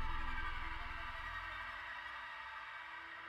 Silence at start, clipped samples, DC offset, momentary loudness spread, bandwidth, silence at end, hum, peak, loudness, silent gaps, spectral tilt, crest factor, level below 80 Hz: 0 s; under 0.1%; under 0.1%; 5 LU; 8.2 kHz; 0 s; none; -28 dBFS; -45 LUFS; none; -4 dB/octave; 16 dB; -48 dBFS